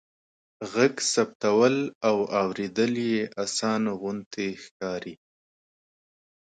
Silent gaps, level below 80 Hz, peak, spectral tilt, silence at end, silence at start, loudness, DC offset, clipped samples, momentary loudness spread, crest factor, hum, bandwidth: 1.35-1.40 s, 1.95-2.01 s, 4.26-4.31 s, 4.71-4.80 s; -70 dBFS; -8 dBFS; -4 dB/octave; 1.45 s; 0.6 s; -26 LUFS; under 0.1%; under 0.1%; 11 LU; 20 dB; none; 9.4 kHz